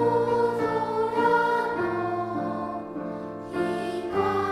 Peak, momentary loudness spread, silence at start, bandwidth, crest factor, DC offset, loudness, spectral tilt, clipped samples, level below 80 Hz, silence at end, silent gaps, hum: -10 dBFS; 11 LU; 0 s; 13 kHz; 16 dB; under 0.1%; -26 LUFS; -6.5 dB/octave; under 0.1%; -58 dBFS; 0 s; none; none